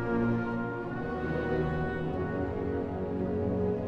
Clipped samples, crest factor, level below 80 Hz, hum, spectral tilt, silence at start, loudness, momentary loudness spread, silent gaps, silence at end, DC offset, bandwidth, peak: under 0.1%; 14 dB; -46 dBFS; none; -9.5 dB/octave; 0 s; -32 LUFS; 4 LU; none; 0 s; under 0.1%; 6.4 kHz; -18 dBFS